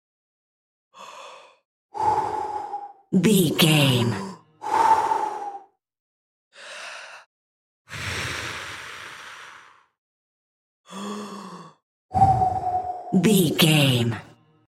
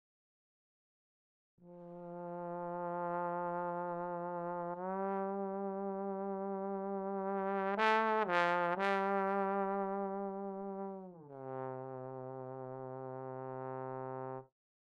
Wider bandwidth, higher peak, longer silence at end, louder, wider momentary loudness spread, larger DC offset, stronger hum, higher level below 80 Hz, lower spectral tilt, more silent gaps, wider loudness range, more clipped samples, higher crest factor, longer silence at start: first, 16 kHz vs 9.8 kHz; first, -4 dBFS vs -16 dBFS; about the same, 0.45 s vs 0.45 s; first, -22 LUFS vs -38 LUFS; first, 23 LU vs 14 LU; neither; neither; first, -54 dBFS vs -84 dBFS; second, -5 dB/octave vs -7 dB/octave; first, 1.65-1.89 s, 6.00-6.51 s, 7.26-7.85 s, 9.98-10.84 s, 11.83-12.09 s vs none; first, 14 LU vs 11 LU; neither; about the same, 22 dB vs 22 dB; second, 0.95 s vs 1.6 s